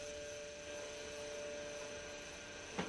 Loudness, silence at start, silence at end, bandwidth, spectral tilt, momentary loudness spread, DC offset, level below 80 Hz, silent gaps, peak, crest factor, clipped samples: -47 LUFS; 0 s; 0 s; 11 kHz; -2.5 dB/octave; 3 LU; under 0.1%; -66 dBFS; none; -28 dBFS; 20 dB; under 0.1%